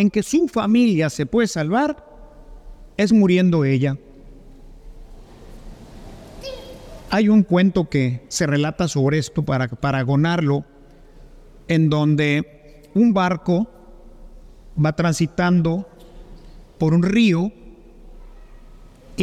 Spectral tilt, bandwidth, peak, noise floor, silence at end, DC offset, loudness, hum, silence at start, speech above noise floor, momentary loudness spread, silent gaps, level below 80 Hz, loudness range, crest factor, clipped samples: -6.5 dB/octave; 13 kHz; -4 dBFS; -45 dBFS; 0 s; under 0.1%; -19 LUFS; none; 0 s; 27 dB; 17 LU; none; -44 dBFS; 4 LU; 16 dB; under 0.1%